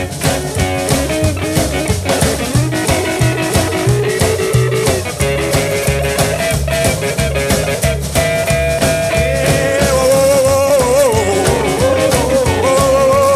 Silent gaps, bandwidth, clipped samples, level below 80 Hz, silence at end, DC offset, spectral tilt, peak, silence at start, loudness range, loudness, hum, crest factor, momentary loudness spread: none; 16 kHz; under 0.1%; -26 dBFS; 0 s; under 0.1%; -4.5 dB/octave; 0 dBFS; 0 s; 3 LU; -13 LUFS; none; 14 dB; 5 LU